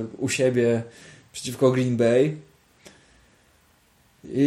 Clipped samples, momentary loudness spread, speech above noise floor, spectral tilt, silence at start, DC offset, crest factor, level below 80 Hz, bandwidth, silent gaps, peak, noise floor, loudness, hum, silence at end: under 0.1%; 18 LU; 38 dB; -6 dB/octave; 0 s; under 0.1%; 18 dB; -62 dBFS; 15 kHz; none; -8 dBFS; -60 dBFS; -23 LUFS; none; 0 s